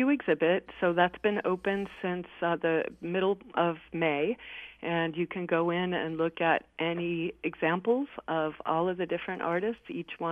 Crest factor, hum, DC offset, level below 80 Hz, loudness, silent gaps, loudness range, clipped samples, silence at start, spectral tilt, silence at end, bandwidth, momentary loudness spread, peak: 20 dB; none; under 0.1%; -64 dBFS; -30 LUFS; none; 2 LU; under 0.1%; 0 s; -8 dB/octave; 0 s; 4.8 kHz; 7 LU; -10 dBFS